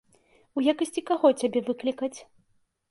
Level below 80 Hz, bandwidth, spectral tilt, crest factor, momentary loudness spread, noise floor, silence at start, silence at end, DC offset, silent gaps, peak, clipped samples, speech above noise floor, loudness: -74 dBFS; 11.5 kHz; -4 dB/octave; 20 dB; 12 LU; -69 dBFS; 0.55 s; 0.7 s; under 0.1%; none; -8 dBFS; under 0.1%; 44 dB; -26 LUFS